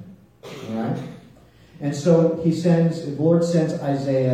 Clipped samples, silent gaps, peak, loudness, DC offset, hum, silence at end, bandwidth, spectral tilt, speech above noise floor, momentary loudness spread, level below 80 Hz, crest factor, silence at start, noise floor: under 0.1%; none; -6 dBFS; -21 LUFS; under 0.1%; none; 0 s; 9.2 kHz; -8 dB/octave; 30 dB; 13 LU; -60 dBFS; 16 dB; 0 s; -49 dBFS